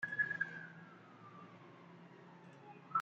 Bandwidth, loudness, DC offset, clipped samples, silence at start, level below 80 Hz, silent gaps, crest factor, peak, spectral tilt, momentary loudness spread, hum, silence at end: 8 kHz; -41 LUFS; under 0.1%; under 0.1%; 0 s; under -90 dBFS; none; 20 dB; -26 dBFS; -3 dB/octave; 21 LU; none; 0 s